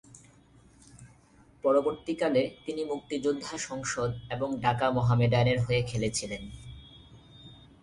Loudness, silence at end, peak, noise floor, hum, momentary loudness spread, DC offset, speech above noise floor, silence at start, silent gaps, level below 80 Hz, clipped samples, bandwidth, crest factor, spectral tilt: -29 LUFS; 0.25 s; -10 dBFS; -59 dBFS; none; 17 LU; under 0.1%; 31 dB; 0.15 s; none; -54 dBFS; under 0.1%; 11.5 kHz; 20 dB; -5.5 dB/octave